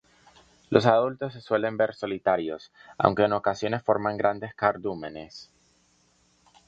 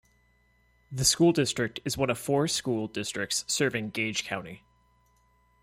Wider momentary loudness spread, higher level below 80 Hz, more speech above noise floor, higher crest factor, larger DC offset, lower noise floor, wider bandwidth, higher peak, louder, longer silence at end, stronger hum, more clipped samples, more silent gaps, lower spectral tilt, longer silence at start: first, 15 LU vs 10 LU; about the same, -62 dBFS vs -58 dBFS; about the same, 39 dB vs 38 dB; first, 26 dB vs 20 dB; neither; about the same, -65 dBFS vs -66 dBFS; second, 7.8 kHz vs 16 kHz; first, 0 dBFS vs -10 dBFS; about the same, -26 LUFS vs -27 LUFS; first, 1.25 s vs 1.05 s; second, none vs 60 Hz at -55 dBFS; neither; neither; first, -6.5 dB/octave vs -3.5 dB/octave; second, 0.7 s vs 0.9 s